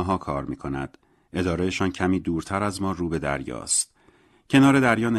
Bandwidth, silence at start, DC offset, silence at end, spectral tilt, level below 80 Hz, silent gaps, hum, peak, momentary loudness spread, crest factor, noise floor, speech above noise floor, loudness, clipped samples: 13 kHz; 0 s; under 0.1%; 0 s; -4.5 dB/octave; -46 dBFS; none; none; -4 dBFS; 14 LU; 20 dB; -58 dBFS; 35 dB; -24 LUFS; under 0.1%